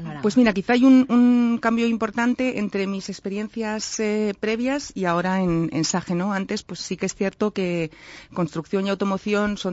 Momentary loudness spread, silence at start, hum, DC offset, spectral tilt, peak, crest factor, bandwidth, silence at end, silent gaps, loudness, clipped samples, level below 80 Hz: 12 LU; 0 s; none; under 0.1%; -5.5 dB/octave; -6 dBFS; 16 dB; 8 kHz; 0 s; none; -22 LUFS; under 0.1%; -52 dBFS